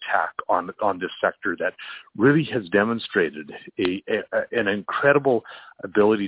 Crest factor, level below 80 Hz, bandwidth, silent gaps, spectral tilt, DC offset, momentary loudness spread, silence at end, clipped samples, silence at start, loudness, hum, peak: 20 dB; -62 dBFS; 4 kHz; none; -10 dB/octave; under 0.1%; 11 LU; 0 s; under 0.1%; 0 s; -23 LUFS; none; -2 dBFS